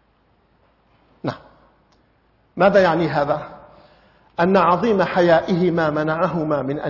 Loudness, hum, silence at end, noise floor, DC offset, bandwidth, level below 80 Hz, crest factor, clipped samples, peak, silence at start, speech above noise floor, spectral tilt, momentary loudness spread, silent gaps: -18 LUFS; none; 0 s; -60 dBFS; under 0.1%; 6 kHz; -54 dBFS; 16 dB; under 0.1%; -4 dBFS; 1.25 s; 43 dB; -7.5 dB/octave; 15 LU; none